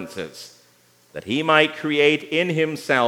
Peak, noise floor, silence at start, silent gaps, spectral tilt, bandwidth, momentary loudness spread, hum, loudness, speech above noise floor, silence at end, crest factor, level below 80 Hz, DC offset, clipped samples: 0 dBFS; -57 dBFS; 0 s; none; -5 dB/octave; 16 kHz; 19 LU; 60 Hz at -55 dBFS; -19 LUFS; 36 dB; 0 s; 20 dB; -70 dBFS; under 0.1%; under 0.1%